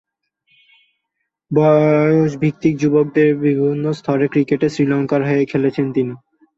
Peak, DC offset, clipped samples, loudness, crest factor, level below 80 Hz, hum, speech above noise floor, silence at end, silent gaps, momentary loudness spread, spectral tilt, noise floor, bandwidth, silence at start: -2 dBFS; under 0.1%; under 0.1%; -16 LUFS; 16 dB; -58 dBFS; none; 60 dB; 0.4 s; none; 6 LU; -8.5 dB/octave; -75 dBFS; 7.8 kHz; 1.5 s